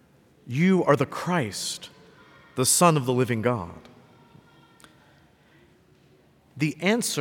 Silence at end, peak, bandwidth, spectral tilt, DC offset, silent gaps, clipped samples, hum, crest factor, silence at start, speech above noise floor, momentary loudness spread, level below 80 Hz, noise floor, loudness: 0 s; -6 dBFS; 19 kHz; -4.5 dB/octave; under 0.1%; none; under 0.1%; none; 20 dB; 0.45 s; 35 dB; 15 LU; -68 dBFS; -58 dBFS; -23 LUFS